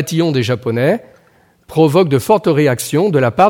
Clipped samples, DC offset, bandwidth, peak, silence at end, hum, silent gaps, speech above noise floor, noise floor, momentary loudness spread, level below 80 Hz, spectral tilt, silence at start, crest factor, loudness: under 0.1%; under 0.1%; 18 kHz; 0 dBFS; 0 s; none; none; 39 dB; -52 dBFS; 5 LU; -54 dBFS; -6 dB/octave; 0 s; 14 dB; -14 LUFS